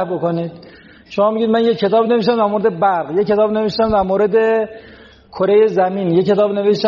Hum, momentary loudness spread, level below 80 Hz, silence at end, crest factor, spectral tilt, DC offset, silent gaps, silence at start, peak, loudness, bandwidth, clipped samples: none; 6 LU; -46 dBFS; 0 s; 12 dB; -5 dB/octave; under 0.1%; none; 0 s; -4 dBFS; -15 LUFS; 7 kHz; under 0.1%